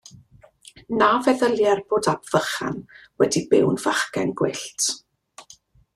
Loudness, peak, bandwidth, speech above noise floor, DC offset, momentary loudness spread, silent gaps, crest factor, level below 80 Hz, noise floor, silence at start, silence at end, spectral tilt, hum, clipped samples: -22 LUFS; -4 dBFS; 13.5 kHz; 31 dB; under 0.1%; 9 LU; none; 18 dB; -60 dBFS; -52 dBFS; 0.9 s; 0.55 s; -4 dB/octave; none; under 0.1%